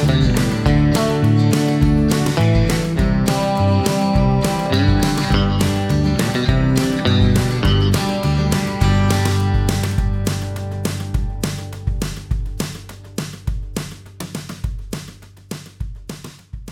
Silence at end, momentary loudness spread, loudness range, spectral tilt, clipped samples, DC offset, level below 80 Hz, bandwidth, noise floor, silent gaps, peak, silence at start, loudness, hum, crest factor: 0 s; 15 LU; 12 LU; -6 dB/octave; under 0.1%; under 0.1%; -26 dBFS; 16.5 kHz; -39 dBFS; none; 0 dBFS; 0 s; -18 LUFS; none; 16 dB